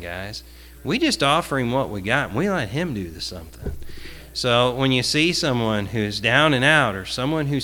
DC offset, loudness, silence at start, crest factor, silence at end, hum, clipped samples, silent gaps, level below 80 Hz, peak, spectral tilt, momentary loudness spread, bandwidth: under 0.1%; -20 LUFS; 0 s; 20 dB; 0 s; none; under 0.1%; none; -42 dBFS; -2 dBFS; -4.5 dB/octave; 18 LU; 19 kHz